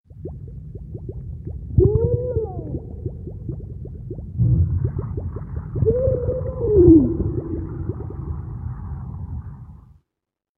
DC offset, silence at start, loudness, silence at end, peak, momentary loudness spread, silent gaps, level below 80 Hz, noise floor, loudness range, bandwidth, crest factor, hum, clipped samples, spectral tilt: under 0.1%; 0.1 s; -22 LUFS; 0.8 s; -2 dBFS; 18 LU; none; -32 dBFS; -85 dBFS; 7 LU; 2.1 kHz; 20 dB; none; under 0.1%; -15 dB/octave